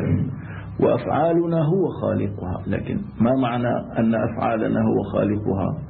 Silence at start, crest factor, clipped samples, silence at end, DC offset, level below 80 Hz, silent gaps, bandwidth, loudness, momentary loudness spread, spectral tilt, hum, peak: 0 s; 14 dB; under 0.1%; 0 s; under 0.1%; -46 dBFS; none; 4.3 kHz; -22 LUFS; 7 LU; -13 dB/octave; none; -8 dBFS